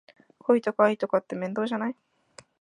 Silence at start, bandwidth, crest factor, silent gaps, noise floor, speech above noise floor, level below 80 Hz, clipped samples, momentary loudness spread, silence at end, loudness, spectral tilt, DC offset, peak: 0.5 s; 10.5 kHz; 20 dB; none; -55 dBFS; 30 dB; -78 dBFS; under 0.1%; 11 LU; 0.7 s; -26 LUFS; -6.5 dB/octave; under 0.1%; -6 dBFS